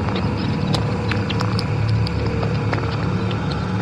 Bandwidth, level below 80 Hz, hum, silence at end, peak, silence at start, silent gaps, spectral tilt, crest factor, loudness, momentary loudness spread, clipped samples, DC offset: 10.5 kHz; -34 dBFS; none; 0 s; -6 dBFS; 0 s; none; -7 dB/octave; 16 dB; -21 LUFS; 2 LU; under 0.1%; under 0.1%